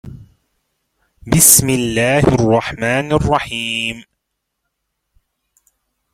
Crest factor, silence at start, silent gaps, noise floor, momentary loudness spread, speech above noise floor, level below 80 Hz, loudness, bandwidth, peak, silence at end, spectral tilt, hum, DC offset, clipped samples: 18 dB; 0.05 s; none; -75 dBFS; 12 LU; 61 dB; -38 dBFS; -13 LUFS; 16.5 kHz; 0 dBFS; 2.1 s; -3.5 dB/octave; none; under 0.1%; under 0.1%